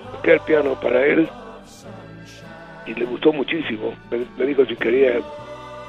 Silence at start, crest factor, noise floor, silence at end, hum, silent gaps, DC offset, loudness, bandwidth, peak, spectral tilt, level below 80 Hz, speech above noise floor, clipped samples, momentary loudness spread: 0 s; 20 dB; -39 dBFS; 0 s; none; none; under 0.1%; -20 LUFS; 9 kHz; -2 dBFS; -6.5 dB/octave; -54 dBFS; 20 dB; under 0.1%; 22 LU